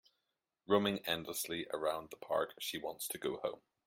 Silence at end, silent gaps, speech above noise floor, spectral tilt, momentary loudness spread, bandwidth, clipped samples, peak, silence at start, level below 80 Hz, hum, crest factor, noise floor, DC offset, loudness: 0.3 s; none; 49 dB; -3.5 dB/octave; 8 LU; 16.5 kHz; under 0.1%; -16 dBFS; 0.7 s; -74 dBFS; none; 22 dB; -87 dBFS; under 0.1%; -38 LUFS